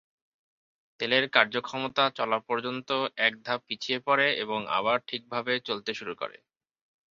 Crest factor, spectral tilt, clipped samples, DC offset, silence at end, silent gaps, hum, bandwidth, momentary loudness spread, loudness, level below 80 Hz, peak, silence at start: 26 dB; -4 dB/octave; under 0.1%; under 0.1%; 0.8 s; none; none; 7.4 kHz; 10 LU; -28 LUFS; -74 dBFS; -4 dBFS; 1 s